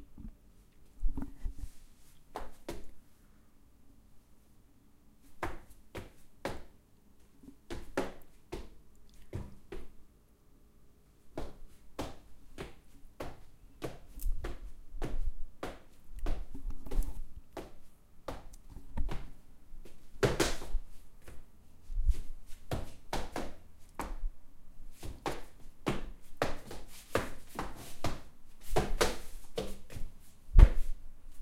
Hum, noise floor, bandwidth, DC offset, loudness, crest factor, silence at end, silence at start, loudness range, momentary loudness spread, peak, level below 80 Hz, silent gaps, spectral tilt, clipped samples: none; -61 dBFS; 15.5 kHz; under 0.1%; -39 LUFS; 28 dB; 0 s; 0 s; 13 LU; 23 LU; -6 dBFS; -38 dBFS; none; -5 dB/octave; under 0.1%